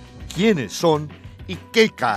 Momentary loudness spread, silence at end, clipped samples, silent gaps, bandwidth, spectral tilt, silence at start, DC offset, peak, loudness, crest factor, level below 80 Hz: 16 LU; 0 s; under 0.1%; none; 15 kHz; -5 dB/octave; 0 s; under 0.1%; -2 dBFS; -20 LUFS; 18 dB; -46 dBFS